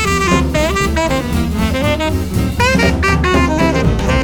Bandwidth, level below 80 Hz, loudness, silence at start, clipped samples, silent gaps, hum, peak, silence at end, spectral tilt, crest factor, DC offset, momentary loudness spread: 19.5 kHz; -20 dBFS; -14 LUFS; 0 s; under 0.1%; none; none; 0 dBFS; 0 s; -5.5 dB/octave; 14 dB; under 0.1%; 4 LU